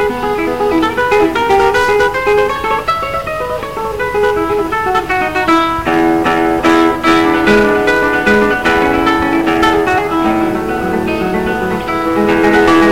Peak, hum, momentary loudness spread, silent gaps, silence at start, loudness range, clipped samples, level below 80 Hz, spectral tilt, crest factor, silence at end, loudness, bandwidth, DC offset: 0 dBFS; 50 Hz at -35 dBFS; 6 LU; none; 0 s; 4 LU; under 0.1%; -34 dBFS; -5 dB/octave; 12 dB; 0 s; -12 LUFS; 16.5 kHz; 1%